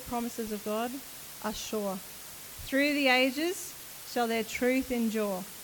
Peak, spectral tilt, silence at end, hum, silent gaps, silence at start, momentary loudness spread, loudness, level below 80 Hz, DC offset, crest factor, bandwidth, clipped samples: -12 dBFS; -3 dB/octave; 0 s; none; none; 0 s; 16 LU; -30 LUFS; -58 dBFS; under 0.1%; 20 dB; 19 kHz; under 0.1%